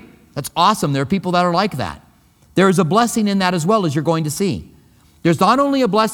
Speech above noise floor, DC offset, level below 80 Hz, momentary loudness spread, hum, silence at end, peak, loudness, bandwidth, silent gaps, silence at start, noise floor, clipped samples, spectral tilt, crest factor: 36 dB; under 0.1%; -50 dBFS; 11 LU; none; 0 s; 0 dBFS; -17 LUFS; 18 kHz; none; 0.35 s; -52 dBFS; under 0.1%; -5.5 dB/octave; 16 dB